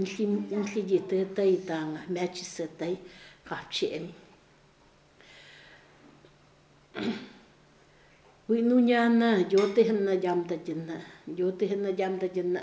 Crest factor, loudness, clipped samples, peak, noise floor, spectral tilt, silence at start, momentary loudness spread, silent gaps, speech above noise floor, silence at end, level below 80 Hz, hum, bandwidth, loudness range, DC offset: 18 dB; -28 LUFS; under 0.1%; -12 dBFS; -60 dBFS; -6 dB/octave; 0 s; 17 LU; none; 33 dB; 0 s; -70 dBFS; none; 8 kHz; 17 LU; under 0.1%